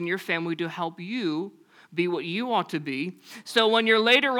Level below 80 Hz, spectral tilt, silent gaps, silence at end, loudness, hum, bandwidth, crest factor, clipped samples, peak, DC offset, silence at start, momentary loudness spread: -76 dBFS; -4.5 dB/octave; none; 0 s; -25 LUFS; none; 18 kHz; 20 dB; under 0.1%; -6 dBFS; under 0.1%; 0 s; 14 LU